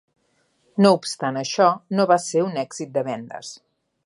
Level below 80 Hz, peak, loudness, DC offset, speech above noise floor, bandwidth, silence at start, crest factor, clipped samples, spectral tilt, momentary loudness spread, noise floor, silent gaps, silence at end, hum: -74 dBFS; -2 dBFS; -21 LUFS; under 0.1%; 46 dB; 11.5 kHz; 0.75 s; 20 dB; under 0.1%; -5 dB/octave; 14 LU; -66 dBFS; none; 0.5 s; none